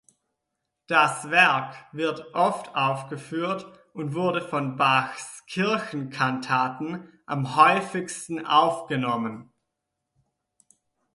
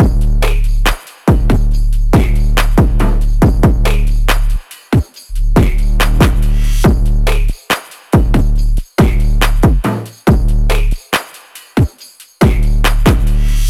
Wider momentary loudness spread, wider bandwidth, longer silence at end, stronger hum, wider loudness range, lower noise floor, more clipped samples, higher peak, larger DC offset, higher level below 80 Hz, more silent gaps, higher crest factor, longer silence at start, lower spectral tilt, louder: first, 15 LU vs 6 LU; second, 11.5 kHz vs 14.5 kHz; first, 1.7 s vs 0 s; neither; about the same, 3 LU vs 2 LU; first, -82 dBFS vs -39 dBFS; neither; about the same, -4 dBFS vs -2 dBFS; neither; second, -72 dBFS vs -12 dBFS; neither; first, 22 dB vs 10 dB; first, 0.9 s vs 0 s; second, -4.5 dB/octave vs -6 dB/octave; second, -24 LUFS vs -14 LUFS